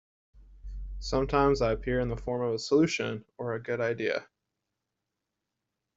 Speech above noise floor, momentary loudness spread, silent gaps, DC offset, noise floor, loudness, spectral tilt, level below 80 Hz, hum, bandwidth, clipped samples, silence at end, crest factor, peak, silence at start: 57 dB; 13 LU; none; under 0.1%; -85 dBFS; -29 LUFS; -6 dB/octave; -44 dBFS; none; 7.8 kHz; under 0.1%; 1.75 s; 20 dB; -10 dBFS; 0.35 s